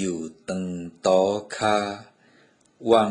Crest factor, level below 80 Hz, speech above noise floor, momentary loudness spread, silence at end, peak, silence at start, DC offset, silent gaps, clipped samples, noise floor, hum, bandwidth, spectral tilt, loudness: 20 dB; -62 dBFS; 36 dB; 13 LU; 0 s; -6 dBFS; 0 s; under 0.1%; none; under 0.1%; -59 dBFS; none; 11 kHz; -5 dB/octave; -24 LUFS